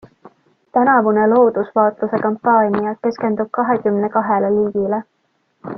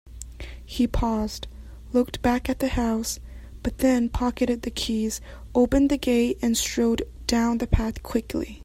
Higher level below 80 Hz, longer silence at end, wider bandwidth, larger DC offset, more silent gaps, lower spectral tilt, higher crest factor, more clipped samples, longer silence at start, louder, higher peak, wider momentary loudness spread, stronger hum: second, -58 dBFS vs -36 dBFS; about the same, 0 s vs 0 s; second, 6 kHz vs 16 kHz; neither; neither; first, -9.5 dB/octave vs -5 dB/octave; about the same, 16 dB vs 20 dB; neither; first, 0.25 s vs 0.05 s; first, -16 LUFS vs -25 LUFS; about the same, -2 dBFS vs -4 dBFS; second, 8 LU vs 14 LU; neither